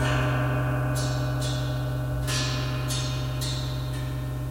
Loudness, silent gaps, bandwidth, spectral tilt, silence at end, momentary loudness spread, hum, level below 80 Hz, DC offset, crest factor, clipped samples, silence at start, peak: -28 LUFS; none; 16 kHz; -5 dB/octave; 0 s; 5 LU; none; -36 dBFS; under 0.1%; 14 dB; under 0.1%; 0 s; -14 dBFS